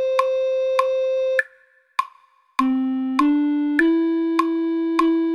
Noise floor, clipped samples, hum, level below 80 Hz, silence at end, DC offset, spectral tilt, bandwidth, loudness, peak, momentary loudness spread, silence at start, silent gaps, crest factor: -56 dBFS; under 0.1%; none; -62 dBFS; 0 s; under 0.1%; -4 dB/octave; 12.5 kHz; -21 LUFS; -2 dBFS; 8 LU; 0 s; none; 18 dB